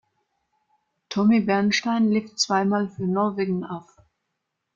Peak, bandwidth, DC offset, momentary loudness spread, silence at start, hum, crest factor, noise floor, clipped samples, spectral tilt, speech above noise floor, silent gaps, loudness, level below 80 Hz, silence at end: -8 dBFS; 7.6 kHz; under 0.1%; 10 LU; 1.1 s; none; 16 dB; -80 dBFS; under 0.1%; -5 dB/octave; 58 dB; none; -23 LUFS; -66 dBFS; 0.95 s